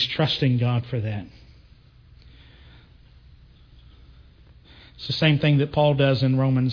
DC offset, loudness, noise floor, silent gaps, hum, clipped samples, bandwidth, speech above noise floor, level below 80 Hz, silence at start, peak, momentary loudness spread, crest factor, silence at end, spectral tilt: under 0.1%; -22 LUFS; -52 dBFS; none; none; under 0.1%; 5.4 kHz; 31 dB; -50 dBFS; 0 s; -8 dBFS; 12 LU; 16 dB; 0 s; -8 dB/octave